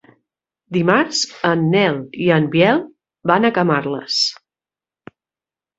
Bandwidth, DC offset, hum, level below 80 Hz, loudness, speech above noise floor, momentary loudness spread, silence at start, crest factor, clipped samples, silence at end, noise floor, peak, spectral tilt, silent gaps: 8.2 kHz; under 0.1%; none; -60 dBFS; -17 LUFS; over 74 dB; 6 LU; 0.7 s; 18 dB; under 0.1%; 1.45 s; under -90 dBFS; 0 dBFS; -5 dB/octave; none